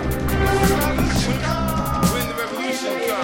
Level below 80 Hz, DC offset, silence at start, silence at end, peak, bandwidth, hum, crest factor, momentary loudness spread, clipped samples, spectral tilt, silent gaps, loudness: -28 dBFS; under 0.1%; 0 s; 0 s; -6 dBFS; 17 kHz; none; 14 dB; 6 LU; under 0.1%; -5 dB/octave; none; -21 LUFS